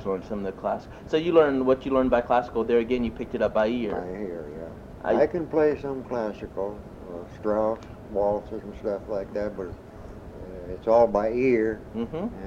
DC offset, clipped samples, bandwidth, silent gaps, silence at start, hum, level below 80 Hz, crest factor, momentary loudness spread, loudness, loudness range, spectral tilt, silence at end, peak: under 0.1%; under 0.1%; 7.4 kHz; none; 0 s; none; -48 dBFS; 20 dB; 18 LU; -26 LUFS; 6 LU; -7.5 dB/octave; 0 s; -6 dBFS